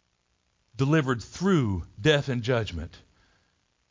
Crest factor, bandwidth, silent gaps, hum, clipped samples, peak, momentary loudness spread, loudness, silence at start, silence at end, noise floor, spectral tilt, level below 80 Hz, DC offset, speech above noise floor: 20 dB; 7.6 kHz; none; none; under 0.1%; -8 dBFS; 10 LU; -26 LUFS; 0.75 s; 0.95 s; -72 dBFS; -6 dB/octave; -48 dBFS; under 0.1%; 47 dB